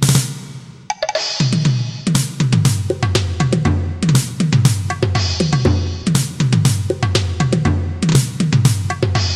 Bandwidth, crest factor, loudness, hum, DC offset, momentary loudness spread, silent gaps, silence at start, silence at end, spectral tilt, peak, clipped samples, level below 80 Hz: 15 kHz; 16 dB; -17 LUFS; none; under 0.1%; 4 LU; none; 0 s; 0 s; -5 dB/octave; 0 dBFS; under 0.1%; -36 dBFS